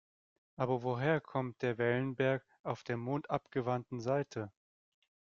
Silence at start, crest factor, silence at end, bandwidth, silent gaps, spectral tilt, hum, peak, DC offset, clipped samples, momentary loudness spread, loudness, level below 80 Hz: 0.6 s; 20 dB; 0.85 s; 7.2 kHz; 2.60-2.64 s; -6 dB/octave; none; -18 dBFS; under 0.1%; under 0.1%; 9 LU; -36 LUFS; -74 dBFS